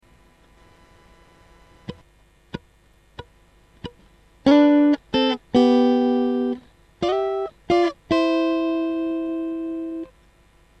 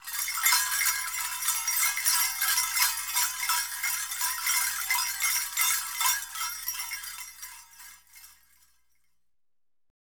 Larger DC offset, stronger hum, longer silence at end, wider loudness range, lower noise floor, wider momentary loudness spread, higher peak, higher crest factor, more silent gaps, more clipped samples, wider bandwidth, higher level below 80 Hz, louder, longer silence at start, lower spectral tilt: neither; about the same, 50 Hz at -60 dBFS vs 60 Hz at -65 dBFS; second, 0.75 s vs 1.7 s; second, 5 LU vs 13 LU; second, -56 dBFS vs under -90 dBFS; first, 24 LU vs 11 LU; first, -4 dBFS vs -8 dBFS; about the same, 18 dB vs 22 dB; neither; neither; second, 8.4 kHz vs over 20 kHz; first, -54 dBFS vs -64 dBFS; first, -21 LUFS vs -26 LUFS; first, 1.9 s vs 0 s; first, -6 dB/octave vs 4.5 dB/octave